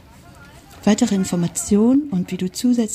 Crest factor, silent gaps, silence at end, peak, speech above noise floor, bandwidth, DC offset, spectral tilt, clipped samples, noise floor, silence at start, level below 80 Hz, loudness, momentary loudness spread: 14 dB; none; 0 s; -4 dBFS; 26 dB; 15.5 kHz; under 0.1%; -5.5 dB/octave; under 0.1%; -44 dBFS; 0.4 s; -50 dBFS; -19 LUFS; 7 LU